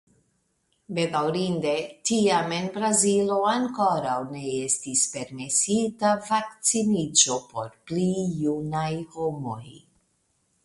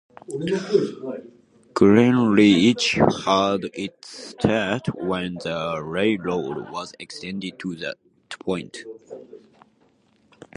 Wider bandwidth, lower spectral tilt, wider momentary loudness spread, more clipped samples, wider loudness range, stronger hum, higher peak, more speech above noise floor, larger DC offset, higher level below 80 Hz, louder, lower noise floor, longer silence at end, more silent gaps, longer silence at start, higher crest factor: about the same, 11.5 kHz vs 11 kHz; second, -3.5 dB/octave vs -5.5 dB/octave; second, 10 LU vs 22 LU; neither; second, 3 LU vs 14 LU; neither; about the same, -4 dBFS vs -2 dBFS; first, 46 dB vs 39 dB; neither; second, -64 dBFS vs -54 dBFS; about the same, -24 LUFS vs -22 LUFS; first, -71 dBFS vs -61 dBFS; second, 0.85 s vs 1.2 s; neither; first, 0.9 s vs 0.3 s; about the same, 22 dB vs 22 dB